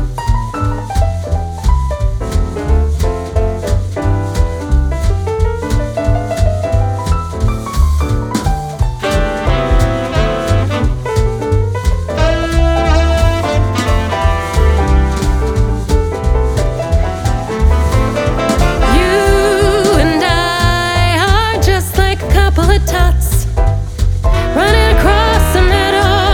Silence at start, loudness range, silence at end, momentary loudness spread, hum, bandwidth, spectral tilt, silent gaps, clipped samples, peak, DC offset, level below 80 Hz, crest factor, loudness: 0 s; 4 LU; 0 s; 6 LU; none; 17 kHz; -5.5 dB/octave; none; under 0.1%; 0 dBFS; under 0.1%; -14 dBFS; 12 dB; -14 LUFS